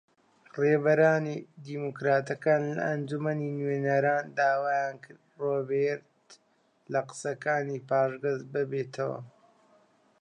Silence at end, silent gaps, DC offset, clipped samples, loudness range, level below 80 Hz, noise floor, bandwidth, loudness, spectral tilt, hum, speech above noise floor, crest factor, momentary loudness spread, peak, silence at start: 0.9 s; none; under 0.1%; under 0.1%; 4 LU; -82 dBFS; -69 dBFS; 10.5 kHz; -29 LUFS; -7 dB/octave; none; 40 dB; 20 dB; 11 LU; -10 dBFS; 0.55 s